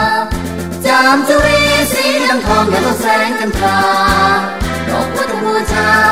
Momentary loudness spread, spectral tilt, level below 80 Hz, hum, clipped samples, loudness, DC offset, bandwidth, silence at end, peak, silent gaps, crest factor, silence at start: 7 LU; -4 dB/octave; -28 dBFS; none; under 0.1%; -12 LUFS; 1%; 16 kHz; 0 s; 0 dBFS; none; 12 dB; 0 s